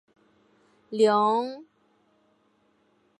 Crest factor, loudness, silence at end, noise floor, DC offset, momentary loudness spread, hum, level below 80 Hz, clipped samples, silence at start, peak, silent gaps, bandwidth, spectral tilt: 20 dB; -24 LUFS; 1.6 s; -67 dBFS; under 0.1%; 17 LU; none; -84 dBFS; under 0.1%; 0.9 s; -10 dBFS; none; 11 kHz; -5 dB/octave